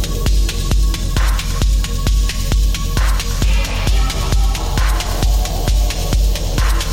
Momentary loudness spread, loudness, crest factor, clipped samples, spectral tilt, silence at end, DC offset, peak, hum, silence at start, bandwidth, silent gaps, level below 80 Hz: 1 LU; -18 LUFS; 10 dB; under 0.1%; -4 dB/octave; 0 s; under 0.1%; -4 dBFS; none; 0 s; 16.5 kHz; none; -16 dBFS